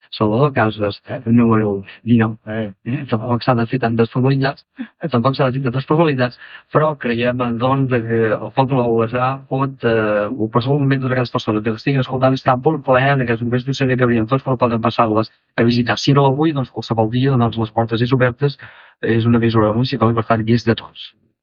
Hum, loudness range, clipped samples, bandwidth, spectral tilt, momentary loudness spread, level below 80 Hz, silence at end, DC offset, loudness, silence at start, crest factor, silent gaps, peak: none; 2 LU; under 0.1%; 7 kHz; -8 dB/octave; 7 LU; -50 dBFS; 0.35 s; under 0.1%; -17 LUFS; 0.1 s; 16 dB; none; -2 dBFS